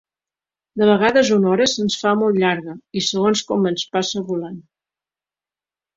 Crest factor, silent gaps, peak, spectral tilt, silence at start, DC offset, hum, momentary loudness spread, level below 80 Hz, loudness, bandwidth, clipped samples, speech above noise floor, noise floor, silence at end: 18 dB; none; -2 dBFS; -4.5 dB/octave; 0.75 s; under 0.1%; none; 12 LU; -60 dBFS; -18 LUFS; 7.8 kHz; under 0.1%; over 72 dB; under -90 dBFS; 1.35 s